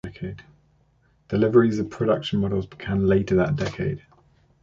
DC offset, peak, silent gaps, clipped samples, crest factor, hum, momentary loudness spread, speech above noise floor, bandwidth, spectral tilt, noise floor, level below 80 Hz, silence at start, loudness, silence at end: under 0.1%; -6 dBFS; none; under 0.1%; 18 dB; none; 17 LU; 40 dB; 7.6 kHz; -8 dB/octave; -62 dBFS; -46 dBFS; 0.05 s; -23 LUFS; 0.65 s